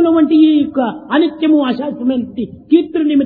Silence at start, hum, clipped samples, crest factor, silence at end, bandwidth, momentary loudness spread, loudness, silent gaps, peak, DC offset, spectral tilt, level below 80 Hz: 0 s; none; under 0.1%; 12 dB; 0 s; 4.6 kHz; 9 LU; -14 LUFS; none; 0 dBFS; under 0.1%; -9.5 dB/octave; -54 dBFS